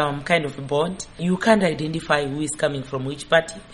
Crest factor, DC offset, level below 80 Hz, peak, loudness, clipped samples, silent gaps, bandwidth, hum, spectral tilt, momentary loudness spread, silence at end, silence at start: 20 dB; under 0.1%; -50 dBFS; -4 dBFS; -22 LUFS; under 0.1%; none; 11.5 kHz; none; -5 dB/octave; 9 LU; 0 s; 0 s